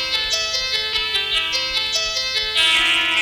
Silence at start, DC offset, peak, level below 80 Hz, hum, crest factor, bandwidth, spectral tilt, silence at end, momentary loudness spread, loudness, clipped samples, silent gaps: 0 s; under 0.1%; -6 dBFS; -44 dBFS; none; 14 dB; 19.5 kHz; 0.5 dB/octave; 0 s; 5 LU; -17 LUFS; under 0.1%; none